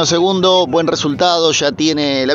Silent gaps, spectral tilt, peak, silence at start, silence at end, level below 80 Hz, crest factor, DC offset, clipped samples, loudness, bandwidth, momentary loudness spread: none; -3.5 dB/octave; 0 dBFS; 0 s; 0 s; -52 dBFS; 12 dB; under 0.1%; under 0.1%; -13 LUFS; 8 kHz; 4 LU